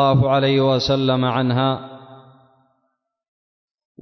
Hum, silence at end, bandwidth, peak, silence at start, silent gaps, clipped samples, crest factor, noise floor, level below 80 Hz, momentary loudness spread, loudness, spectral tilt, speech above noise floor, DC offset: none; 1.85 s; 6.4 kHz; -6 dBFS; 0 s; none; under 0.1%; 14 dB; -73 dBFS; -50 dBFS; 7 LU; -18 LUFS; -7 dB/octave; 56 dB; under 0.1%